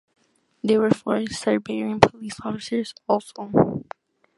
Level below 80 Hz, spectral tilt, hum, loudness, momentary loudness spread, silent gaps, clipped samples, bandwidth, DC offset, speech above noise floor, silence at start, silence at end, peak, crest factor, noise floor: -52 dBFS; -6 dB/octave; none; -23 LUFS; 12 LU; none; under 0.1%; 11.5 kHz; under 0.1%; 22 dB; 0.65 s; 0.55 s; 0 dBFS; 24 dB; -44 dBFS